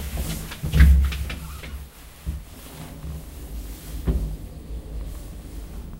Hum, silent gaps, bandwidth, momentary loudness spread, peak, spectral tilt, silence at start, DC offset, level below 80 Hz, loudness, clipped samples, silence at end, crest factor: none; none; 16 kHz; 21 LU; -2 dBFS; -6 dB/octave; 0 s; under 0.1%; -26 dBFS; -25 LUFS; under 0.1%; 0 s; 22 dB